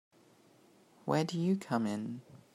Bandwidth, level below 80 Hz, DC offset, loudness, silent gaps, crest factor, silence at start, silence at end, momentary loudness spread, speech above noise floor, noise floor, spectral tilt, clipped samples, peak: 14 kHz; -80 dBFS; under 0.1%; -35 LUFS; none; 20 dB; 1.05 s; 0.15 s; 12 LU; 31 dB; -64 dBFS; -6.5 dB/octave; under 0.1%; -16 dBFS